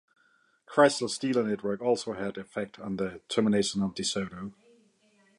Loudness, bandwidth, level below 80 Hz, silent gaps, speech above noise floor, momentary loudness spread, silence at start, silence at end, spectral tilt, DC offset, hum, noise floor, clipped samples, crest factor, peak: -29 LUFS; 11.5 kHz; -64 dBFS; none; 39 dB; 13 LU; 0.7 s; 0.9 s; -4.5 dB/octave; under 0.1%; none; -67 dBFS; under 0.1%; 22 dB; -8 dBFS